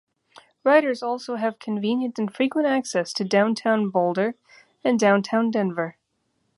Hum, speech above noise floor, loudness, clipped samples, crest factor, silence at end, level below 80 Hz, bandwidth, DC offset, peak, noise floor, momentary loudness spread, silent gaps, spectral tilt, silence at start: none; 50 dB; -23 LUFS; under 0.1%; 18 dB; 0.65 s; -74 dBFS; 11.5 kHz; under 0.1%; -4 dBFS; -72 dBFS; 9 LU; none; -5.5 dB/octave; 0.65 s